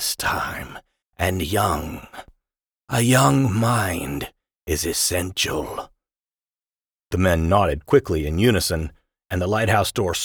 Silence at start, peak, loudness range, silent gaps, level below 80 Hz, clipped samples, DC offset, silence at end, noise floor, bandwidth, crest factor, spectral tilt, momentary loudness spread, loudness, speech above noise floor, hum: 0 s; -4 dBFS; 4 LU; 6.34-6.38 s, 6.92-6.96 s; -38 dBFS; under 0.1%; under 0.1%; 0 s; under -90 dBFS; over 20 kHz; 18 dB; -4.5 dB/octave; 16 LU; -21 LUFS; over 69 dB; none